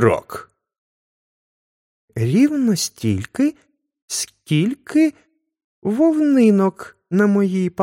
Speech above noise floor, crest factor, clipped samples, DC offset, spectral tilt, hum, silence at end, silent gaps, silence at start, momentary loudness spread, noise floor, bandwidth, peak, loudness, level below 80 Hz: over 73 dB; 18 dB; under 0.1%; under 0.1%; -6 dB/octave; none; 0 s; 0.78-2.08 s, 4.02-4.08 s, 5.64-5.82 s; 0 s; 11 LU; under -90 dBFS; 16.5 kHz; -2 dBFS; -18 LUFS; -60 dBFS